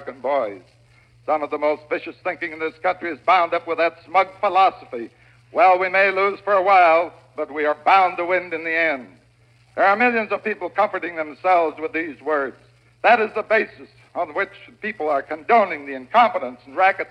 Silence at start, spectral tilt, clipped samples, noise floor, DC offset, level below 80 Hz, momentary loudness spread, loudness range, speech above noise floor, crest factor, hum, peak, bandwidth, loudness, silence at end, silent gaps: 0 s; -5.5 dB/octave; under 0.1%; -55 dBFS; under 0.1%; -66 dBFS; 14 LU; 5 LU; 35 dB; 18 dB; none; -2 dBFS; 8 kHz; -20 LUFS; 0.05 s; none